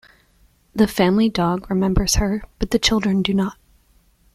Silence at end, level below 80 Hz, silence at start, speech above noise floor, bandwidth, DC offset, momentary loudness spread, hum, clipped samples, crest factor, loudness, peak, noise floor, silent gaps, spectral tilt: 0.8 s; -32 dBFS; 0.75 s; 39 dB; 15 kHz; under 0.1%; 7 LU; none; under 0.1%; 18 dB; -19 LUFS; -2 dBFS; -57 dBFS; none; -4.5 dB/octave